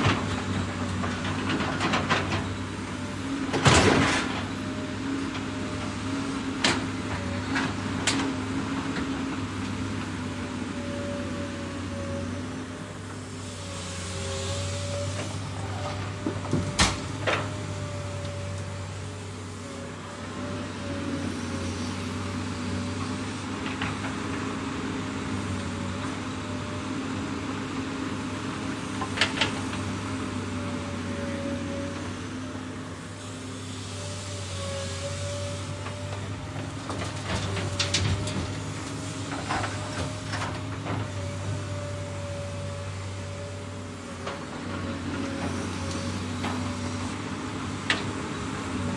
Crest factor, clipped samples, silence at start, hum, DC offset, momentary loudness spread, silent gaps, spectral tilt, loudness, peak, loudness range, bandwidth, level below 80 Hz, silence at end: 26 dB; under 0.1%; 0 s; none; under 0.1%; 10 LU; none; -4.5 dB/octave; -30 LUFS; -4 dBFS; 9 LU; 11.5 kHz; -50 dBFS; 0 s